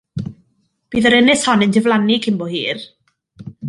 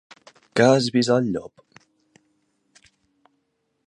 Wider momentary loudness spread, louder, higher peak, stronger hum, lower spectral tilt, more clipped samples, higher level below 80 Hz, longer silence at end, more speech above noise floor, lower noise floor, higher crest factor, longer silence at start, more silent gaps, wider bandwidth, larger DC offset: first, 17 LU vs 10 LU; first, -15 LUFS vs -20 LUFS; about the same, -2 dBFS vs -2 dBFS; neither; about the same, -4.5 dB/octave vs -5.5 dB/octave; neither; first, -52 dBFS vs -64 dBFS; second, 0 s vs 2.4 s; second, 49 dB vs 53 dB; second, -63 dBFS vs -73 dBFS; second, 16 dB vs 22 dB; second, 0.15 s vs 0.55 s; neither; about the same, 11.5 kHz vs 11 kHz; neither